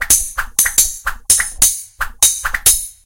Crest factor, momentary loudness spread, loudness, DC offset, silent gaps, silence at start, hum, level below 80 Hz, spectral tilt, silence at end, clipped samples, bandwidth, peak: 16 dB; 8 LU; -13 LUFS; under 0.1%; none; 0 s; none; -32 dBFS; 1.5 dB/octave; 0.15 s; 0.2%; over 20 kHz; 0 dBFS